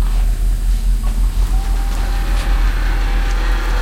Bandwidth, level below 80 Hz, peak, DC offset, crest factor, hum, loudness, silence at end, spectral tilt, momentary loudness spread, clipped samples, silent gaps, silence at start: 14.5 kHz; -14 dBFS; -6 dBFS; under 0.1%; 8 dB; none; -20 LUFS; 0 s; -5 dB/octave; 2 LU; under 0.1%; none; 0 s